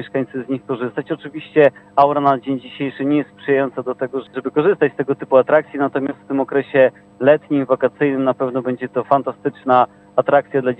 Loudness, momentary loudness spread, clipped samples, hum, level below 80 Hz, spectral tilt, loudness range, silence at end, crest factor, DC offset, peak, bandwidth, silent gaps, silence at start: -18 LUFS; 10 LU; under 0.1%; 50 Hz at -50 dBFS; -66 dBFS; -9 dB/octave; 2 LU; 0.05 s; 18 dB; under 0.1%; 0 dBFS; 5 kHz; none; 0 s